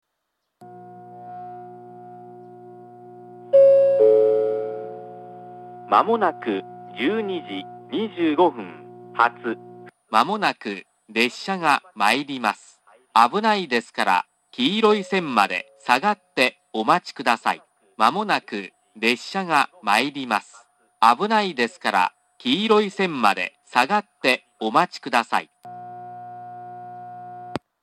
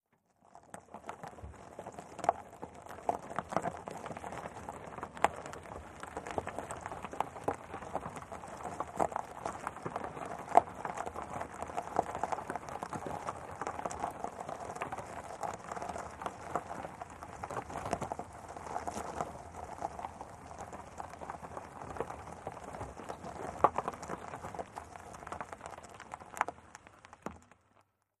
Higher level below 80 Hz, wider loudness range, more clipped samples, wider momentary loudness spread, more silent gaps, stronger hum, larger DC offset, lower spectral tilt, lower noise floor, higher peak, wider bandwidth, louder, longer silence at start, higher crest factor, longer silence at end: second, -76 dBFS vs -62 dBFS; second, 5 LU vs 8 LU; neither; first, 20 LU vs 13 LU; neither; neither; neither; about the same, -4 dB/octave vs -5 dB/octave; first, -77 dBFS vs -71 dBFS; first, 0 dBFS vs -6 dBFS; first, 14.5 kHz vs 13 kHz; first, -21 LUFS vs -40 LUFS; first, 0.6 s vs 0.45 s; second, 22 dB vs 34 dB; second, 0.25 s vs 0.75 s